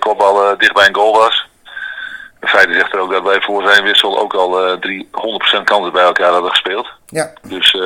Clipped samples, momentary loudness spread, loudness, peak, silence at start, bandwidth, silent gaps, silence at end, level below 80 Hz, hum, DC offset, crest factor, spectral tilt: 0.5%; 14 LU; -12 LUFS; 0 dBFS; 0 s; over 20 kHz; none; 0 s; -56 dBFS; none; under 0.1%; 14 dB; -2 dB/octave